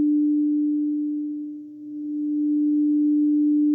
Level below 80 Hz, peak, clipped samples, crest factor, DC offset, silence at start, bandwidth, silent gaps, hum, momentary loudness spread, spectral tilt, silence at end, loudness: -80 dBFS; -16 dBFS; under 0.1%; 6 dB; under 0.1%; 0 s; 0.6 kHz; none; none; 14 LU; -11.5 dB/octave; 0 s; -22 LUFS